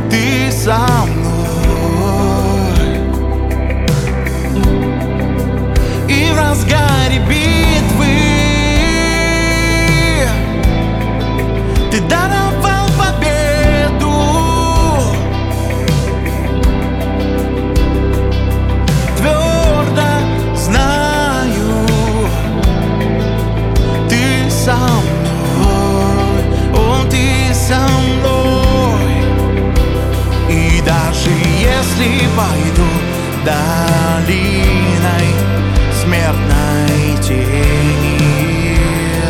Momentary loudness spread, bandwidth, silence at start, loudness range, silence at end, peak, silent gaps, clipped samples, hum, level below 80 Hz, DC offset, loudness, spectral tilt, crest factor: 4 LU; 17 kHz; 0 s; 3 LU; 0 s; 0 dBFS; none; under 0.1%; none; -18 dBFS; under 0.1%; -13 LUFS; -5.5 dB/octave; 12 dB